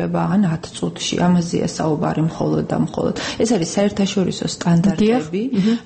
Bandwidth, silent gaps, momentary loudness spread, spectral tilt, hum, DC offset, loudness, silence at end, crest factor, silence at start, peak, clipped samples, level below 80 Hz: 8.8 kHz; none; 5 LU; -6 dB/octave; none; under 0.1%; -19 LUFS; 0 s; 12 dB; 0 s; -6 dBFS; under 0.1%; -48 dBFS